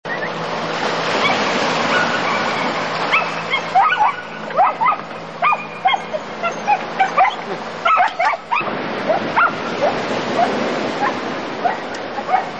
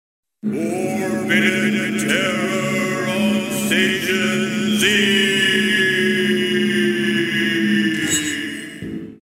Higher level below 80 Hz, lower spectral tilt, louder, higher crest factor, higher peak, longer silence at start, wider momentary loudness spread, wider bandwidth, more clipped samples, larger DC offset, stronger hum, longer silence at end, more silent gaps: about the same, -60 dBFS vs -58 dBFS; about the same, -4 dB/octave vs -3.5 dB/octave; about the same, -18 LUFS vs -18 LUFS; about the same, 14 dB vs 16 dB; about the same, -4 dBFS vs -2 dBFS; second, 0.05 s vs 0.45 s; about the same, 8 LU vs 8 LU; second, 8.8 kHz vs 16 kHz; neither; first, 0.5% vs under 0.1%; neither; about the same, 0 s vs 0.05 s; neither